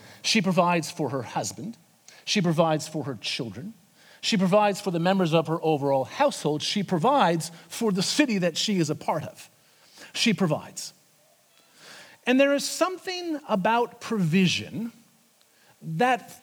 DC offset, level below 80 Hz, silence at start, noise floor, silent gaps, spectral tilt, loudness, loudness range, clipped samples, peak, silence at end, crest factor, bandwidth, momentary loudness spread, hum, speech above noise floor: under 0.1%; -76 dBFS; 0.05 s; -61 dBFS; none; -4.5 dB/octave; -25 LUFS; 4 LU; under 0.1%; -6 dBFS; 0.05 s; 20 dB; 19 kHz; 14 LU; none; 36 dB